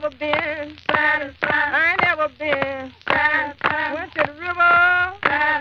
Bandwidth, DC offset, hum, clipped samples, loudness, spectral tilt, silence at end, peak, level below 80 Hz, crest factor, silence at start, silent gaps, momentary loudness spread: 7.4 kHz; under 0.1%; none; under 0.1%; -19 LUFS; -5 dB/octave; 0 s; 0 dBFS; -52 dBFS; 20 dB; 0 s; none; 8 LU